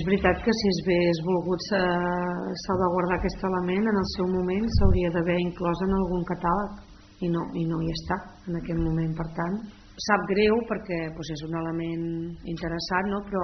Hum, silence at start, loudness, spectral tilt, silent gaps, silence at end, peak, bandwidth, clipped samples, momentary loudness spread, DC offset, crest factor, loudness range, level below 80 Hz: none; 0 s; -27 LUFS; -5.5 dB/octave; none; 0 s; -6 dBFS; 6.4 kHz; under 0.1%; 9 LU; under 0.1%; 20 dB; 4 LU; -38 dBFS